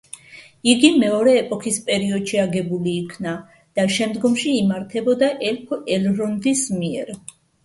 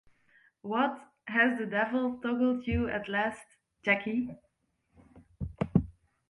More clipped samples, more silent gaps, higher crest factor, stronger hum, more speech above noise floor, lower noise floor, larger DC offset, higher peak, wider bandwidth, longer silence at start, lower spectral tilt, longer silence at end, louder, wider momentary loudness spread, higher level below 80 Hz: neither; neither; about the same, 20 dB vs 22 dB; neither; second, 26 dB vs 45 dB; second, -45 dBFS vs -75 dBFS; neither; first, 0 dBFS vs -10 dBFS; about the same, 11.5 kHz vs 11.5 kHz; second, 0.3 s vs 0.65 s; second, -4.5 dB/octave vs -7.5 dB/octave; about the same, 0.45 s vs 0.4 s; first, -20 LUFS vs -30 LUFS; second, 13 LU vs 16 LU; second, -60 dBFS vs -50 dBFS